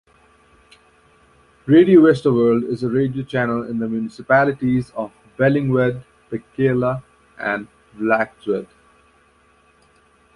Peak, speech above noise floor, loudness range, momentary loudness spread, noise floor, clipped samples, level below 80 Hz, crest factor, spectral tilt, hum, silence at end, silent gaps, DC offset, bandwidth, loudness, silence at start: -2 dBFS; 38 dB; 7 LU; 17 LU; -56 dBFS; under 0.1%; -54 dBFS; 18 dB; -8.5 dB/octave; none; 1.7 s; none; under 0.1%; 11 kHz; -18 LUFS; 1.65 s